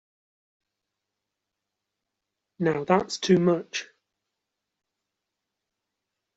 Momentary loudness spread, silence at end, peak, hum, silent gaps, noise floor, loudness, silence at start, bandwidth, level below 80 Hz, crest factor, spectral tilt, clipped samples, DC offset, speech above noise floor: 11 LU; 2.55 s; -6 dBFS; none; none; -85 dBFS; -25 LUFS; 2.6 s; 8 kHz; -68 dBFS; 24 dB; -5 dB/octave; under 0.1%; under 0.1%; 61 dB